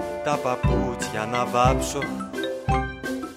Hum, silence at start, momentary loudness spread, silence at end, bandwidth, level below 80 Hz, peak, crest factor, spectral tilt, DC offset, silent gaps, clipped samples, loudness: none; 0 s; 9 LU; 0 s; 16 kHz; -34 dBFS; -6 dBFS; 18 dB; -5.5 dB/octave; under 0.1%; none; under 0.1%; -25 LUFS